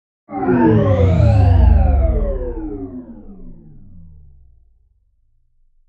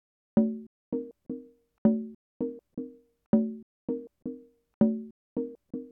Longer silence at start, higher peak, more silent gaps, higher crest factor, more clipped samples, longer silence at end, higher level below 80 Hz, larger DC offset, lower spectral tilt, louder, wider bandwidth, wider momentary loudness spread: about the same, 0.3 s vs 0.35 s; first, -2 dBFS vs -12 dBFS; second, none vs 0.67-0.92 s, 1.78-1.85 s, 2.15-2.40 s, 3.26-3.33 s, 3.63-3.88 s, 4.74-4.81 s, 5.11-5.36 s; about the same, 16 dB vs 20 dB; neither; first, 1.95 s vs 0 s; first, -22 dBFS vs -62 dBFS; neither; second, -10.5 dB/octave vs -12.5 dB/octave; first, -15 LUFS vs -32 LUFS; first, 4.9 kHz vs 2.2 kHz; first, 18 LU vs 14 LU